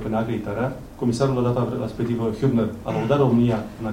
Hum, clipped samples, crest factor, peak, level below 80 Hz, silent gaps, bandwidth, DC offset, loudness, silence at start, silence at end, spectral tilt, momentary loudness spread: none; under 0.1%; 16 dB; -6 dBFS; -44 dBFS; none; 15.5 kHz; under 0.1%; -23 LUFS; 0 s; 0 s; -8 dB/octave; 8 LU